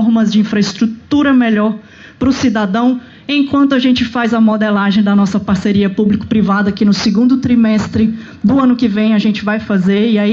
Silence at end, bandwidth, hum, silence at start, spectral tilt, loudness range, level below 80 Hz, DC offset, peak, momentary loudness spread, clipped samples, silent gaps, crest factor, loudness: 0 s; 7.6 kHz; none; 0 s; -6.5 dB/octave; 1 LU; -44 dBFS; under 0.1%; -2 dBFS; 5 LU; under 0.1%; none; 10 dB; -13 LUFS